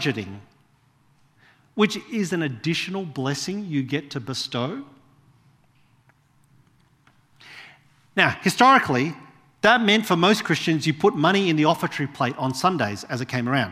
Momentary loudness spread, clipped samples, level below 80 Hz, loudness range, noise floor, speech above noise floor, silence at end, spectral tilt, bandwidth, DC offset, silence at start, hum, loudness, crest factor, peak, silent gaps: 12 LU; under 0.1%; -66 dBFS; 12 LU; -61 dBFS; 39 dB; 0 s; -5 dB/octave; 15.5 kHz; under 0.1%; 0 s; none; -22 LUFS; 22 dB; -2 dBFS; none